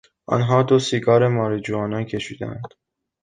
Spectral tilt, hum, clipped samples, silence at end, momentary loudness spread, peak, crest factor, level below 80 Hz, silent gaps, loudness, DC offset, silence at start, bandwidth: -6.5 dB/octave; none; under 0.1%; 0.55 s; 15 LU; -4 dBFS; 18 dB; -54 dBFS; none; -20 LUFS; under 0.1%; 0.3 s; 9.6 kHz